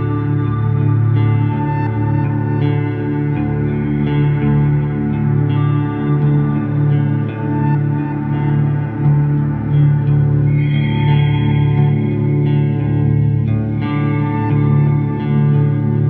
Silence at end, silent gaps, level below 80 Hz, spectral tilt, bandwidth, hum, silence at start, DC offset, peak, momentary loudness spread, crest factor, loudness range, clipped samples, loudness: 0 s; none; -36 dBFS; -12 dB/octave; 3.7 kHz; none; 0 s; under 0.1%; -4 dBFS; 4 LU; 12 dB; 2 LU; under 0.1%; -16 LUFS